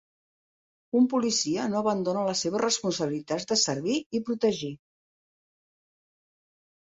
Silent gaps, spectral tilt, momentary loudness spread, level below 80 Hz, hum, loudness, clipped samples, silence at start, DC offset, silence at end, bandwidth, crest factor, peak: 4.06-4.10 s; -3.5 dB/octave; 7 LU; -70 dBFS; none; -27 LUFS; under 0.1%; 0.95 s; under 0.1%; 2.2 s; 8.2 kHz; 18 dB; -12 dBFS